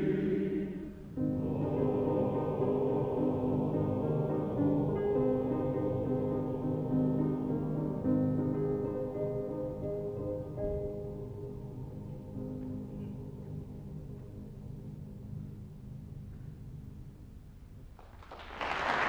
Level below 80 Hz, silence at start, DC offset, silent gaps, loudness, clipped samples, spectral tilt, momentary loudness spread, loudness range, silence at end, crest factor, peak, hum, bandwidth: -52 dBFS; 0 s; under 0.1%; none; -34 LUFS; under 0.1%; -9 dB/octave; 17 LU; 15 LU; 0 s; 18 dB; -16 dBFS; none; 7.8 kHz